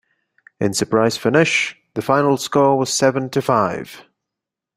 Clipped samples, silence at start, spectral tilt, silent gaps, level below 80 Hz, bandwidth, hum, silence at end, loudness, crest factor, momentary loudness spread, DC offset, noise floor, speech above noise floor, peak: under 0.1%; 0.6 s; -4.5 dB/octave; none; -58 dBFS; 16 kHz; none; 0.75 s; -18 LUFS; 18 dB; 8 LU; under 0.1%; -84 dBFS; 67 dB; -2 dBFS